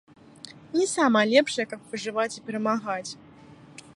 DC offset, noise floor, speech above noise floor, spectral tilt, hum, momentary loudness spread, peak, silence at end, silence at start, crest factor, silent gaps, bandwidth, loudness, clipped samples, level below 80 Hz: under 0.1%; -50 dBFS; 25 dB; -3.5 dB/octave; none; 23 LU; -6 dBFS; 0.15 s; 0.45 s; 22 dB; none; 11.5 kHz; -25 LUFS; under 0.1%; -72 dBFS